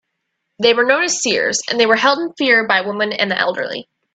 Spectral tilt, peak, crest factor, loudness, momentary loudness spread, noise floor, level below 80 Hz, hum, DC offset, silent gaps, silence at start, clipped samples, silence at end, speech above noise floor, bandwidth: -1.5 dB/octave; 0 dBFS; 16 dB; -15 LUFS; 7 LU; -74 dBFS; -64 dBFS; none; under 0.1%; none; 0.6 s; under 0.1%; 0.35 s; 58 dB; 9.2 kHz